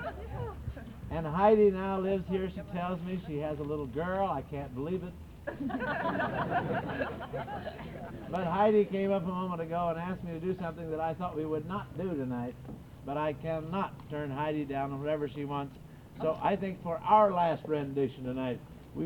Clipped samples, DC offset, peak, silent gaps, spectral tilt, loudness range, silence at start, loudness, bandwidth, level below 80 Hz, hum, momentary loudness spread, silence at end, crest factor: under 0.1%; under 0.1%; -12 dBFS; none; -8.5 dB/octave; 5 LU; 0 s; -33 LUFS; 19.5 kHz; -52 dBFS; none; 15 LU; 0 s; 20 dB